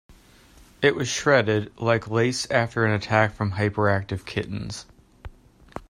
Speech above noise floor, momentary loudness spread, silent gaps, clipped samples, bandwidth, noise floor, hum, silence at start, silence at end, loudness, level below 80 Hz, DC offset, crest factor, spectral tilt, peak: 29 dB; 11 LU; none; under 0.1%; 12.5 kHz; -52 dBFS; none; 0.8 s; 0.1 s; -23 LUFS; -52 dBFS; under 0.1%; 20 dB; -5 dB/octave; -4 dBFS